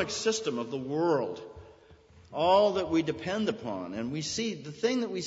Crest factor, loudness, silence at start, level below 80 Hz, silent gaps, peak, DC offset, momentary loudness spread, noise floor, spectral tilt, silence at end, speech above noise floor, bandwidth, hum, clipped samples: 20 dB; -30 LUFS; 0 s; -62 dBFS; none; -10 dBFS; under 0.1%; 12 LU; -56 dBFS; -4.5 dB/octave; 0 s; 27 dB; 8 kHz; none; under 0.1%